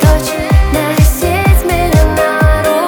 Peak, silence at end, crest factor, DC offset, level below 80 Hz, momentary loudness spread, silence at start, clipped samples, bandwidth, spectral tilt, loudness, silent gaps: 0 dBFS; 0 s; 10 dB; under 0.1%; -14 dBFS; 2 LU; 0 s; under 0.1%; over 20 kHz; -5.5 dB/octave; -11 LUFS; none